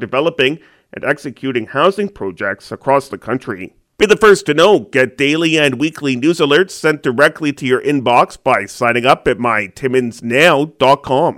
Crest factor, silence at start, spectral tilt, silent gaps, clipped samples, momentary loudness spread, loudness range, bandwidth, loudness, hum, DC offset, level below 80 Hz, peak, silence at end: 14 dB; 0 s; -4.5 dB/octave; none; under 0.1%; 11 LU; 5 LU; 16 kHz; -14 LUFS; none; under 0.1%; -50 dBFS; 0 dBFS; 0.05 s